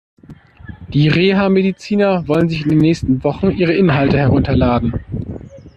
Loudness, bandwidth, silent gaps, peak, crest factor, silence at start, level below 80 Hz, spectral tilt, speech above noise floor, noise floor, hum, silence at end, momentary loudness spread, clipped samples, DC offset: -15 LUFS; 8.4 kHz; none; -2 dBFS; 14 dB; 0.3 s; -36 dBFS; -8 dB/octave; 26 dB; -39 dBFS; none; 0.05 s; 10 LU; under 0.1%; under 0.1%